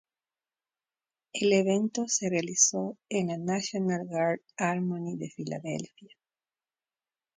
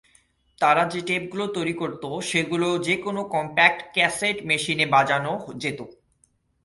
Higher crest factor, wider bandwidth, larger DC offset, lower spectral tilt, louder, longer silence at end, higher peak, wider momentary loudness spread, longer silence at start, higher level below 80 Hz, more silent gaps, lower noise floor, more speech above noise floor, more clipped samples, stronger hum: about the same, 22 dB vs 22 dB; second, 10 kHz vs 11.5 kHz; neither; about the same, -4 dB/octave vs -4 dB/octave; second, -29 LUFS vs -23 LUFS; first, 1.3 s vs 0.75 s; second, -8 dBFS vs -2 dBFS; about the same, 13 LU vs 11 LU; first, 1.35 s vs 0.6 s; second, -74 dBFS vs -62 dBFS; neither; first, under -90 dBFS vs -66 dBFS; first, over 61 dB vs 42 dB; neither; neither